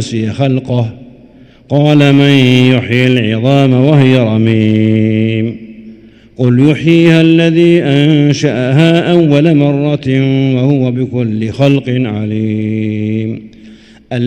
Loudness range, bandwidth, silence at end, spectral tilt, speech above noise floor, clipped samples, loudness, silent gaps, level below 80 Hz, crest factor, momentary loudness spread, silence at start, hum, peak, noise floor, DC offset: 4 LU; 9.2 kHz; 0 s; -7.5 dB/octave; 30 dB; 2%; -10 LUFS; none; -48 dBFS; 10 dB; 9 LU; 0 s; none; 0 dBFS; -39 dBFS; under 0.1%